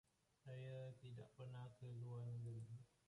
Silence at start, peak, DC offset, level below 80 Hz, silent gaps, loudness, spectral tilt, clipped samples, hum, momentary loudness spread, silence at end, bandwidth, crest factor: 0.45 s; -44 dBFS; under 0.1%; -82 dBFS; none; -55 LUFS; -8 dB/octave; under 0.1%; none; 7 LU; 0.2 s; 11 kHz; 10 dB